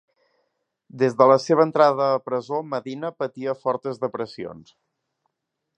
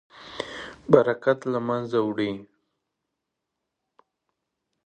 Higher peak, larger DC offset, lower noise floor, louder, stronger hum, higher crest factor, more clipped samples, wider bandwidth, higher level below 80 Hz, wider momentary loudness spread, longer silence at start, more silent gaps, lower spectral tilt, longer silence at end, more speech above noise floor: about the same, -2 dBFS vs 0 dBFS; neither; about the same, -81 dBFS vs -83 dBFS; about the same, -22 LUFS vs -24 LUFS; neither; about the same, 22 dB vs 26 dB; neither; about the same, 8.8 kHz vs 9.2 kHz; second, -72 dBFS vs -64 dBFS; about the same, 15 LU vs 17 LU; first, 0.95 s vs 0.2 s; neither; about the same, -6.5 dB/octave vs -7 dB/octave; second, 1.15 s vs 2.4 s; about the same, 59 dB vs 60 dB